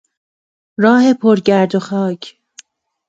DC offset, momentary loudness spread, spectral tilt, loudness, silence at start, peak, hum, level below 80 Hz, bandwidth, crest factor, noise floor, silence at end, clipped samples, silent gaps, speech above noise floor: under 0.1%; 18 LU; -6.5 dB/octave; -13 LUFS; 0.8 s; 0 dBFS; none; -62 dBFS; 7.8 kHz; 16 dB; -45 dBFS; 0.8 s; under 0.1%; none; 32 dB